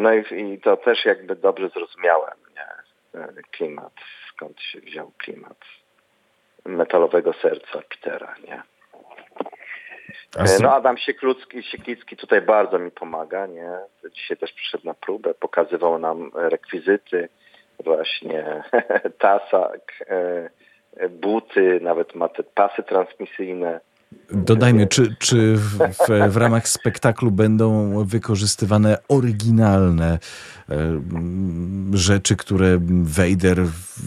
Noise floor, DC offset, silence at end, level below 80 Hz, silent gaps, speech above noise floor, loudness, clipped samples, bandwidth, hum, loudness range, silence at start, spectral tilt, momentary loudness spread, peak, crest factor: -63 dBFS; under 0.1%; 0 s; -44 dBFS; none; 44 dB; -20 LUFS; under 0.1%; 14 kHz; none; 10 LU; 0 s; -5.5 dB/octave; 19 LU; -2 dBFS; 20 dB